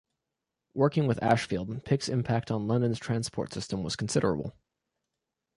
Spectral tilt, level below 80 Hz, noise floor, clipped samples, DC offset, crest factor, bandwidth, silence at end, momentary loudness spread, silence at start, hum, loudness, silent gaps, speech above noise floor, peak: -6 dB/octave; -56 dBFS; -86 dBFS; under 0.1%; under 0.1%; 20 dB; 11.5 kHz; 1.05 s; 8 LU; 0.75 s; none; -29 LUFS; none; 58 dB; -10 dBFS